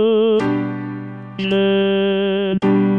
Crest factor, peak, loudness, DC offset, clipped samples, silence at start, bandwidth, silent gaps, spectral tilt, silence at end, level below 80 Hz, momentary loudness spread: 10 dB; -6 dBFS; -18 LUFS; under 0.1%; under 0.1%; 0 s; 6 kHz; none; -8 dB/octave; 0 s; -58 dBFS; 12 LU